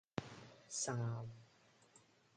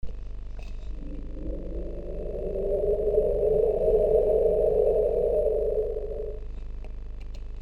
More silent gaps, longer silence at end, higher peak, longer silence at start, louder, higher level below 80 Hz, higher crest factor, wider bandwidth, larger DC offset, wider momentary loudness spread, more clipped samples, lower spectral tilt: neither; first, 0.35 s vs 0 s; second, -22 dBFS vs -10 dBFS; about the same, 0.15 s vs 0.05 s; second, -44 LUFS vs -26 LUFS; second, -76 dBFS vs -34 dBFS; first, 26 dB vs 16 dB; about the same, 10 kHz vs 11 kHz; neither; about the same, 17 LU vs 19 LU; neither; second, -4 dB/octave vs -9.5 dB/octave